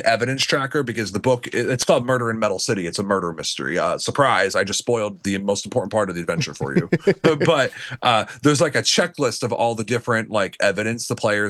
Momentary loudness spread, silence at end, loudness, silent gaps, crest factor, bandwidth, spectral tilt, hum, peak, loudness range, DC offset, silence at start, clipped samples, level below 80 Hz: 6 LU; 0 s; -20 LUFS; none; 16 dB; 12.5 kHz; -4 dB/octave; none; -4 dBFS; 2 LU; under 0.1%; 0 s; under 0.1%; -60 dBFS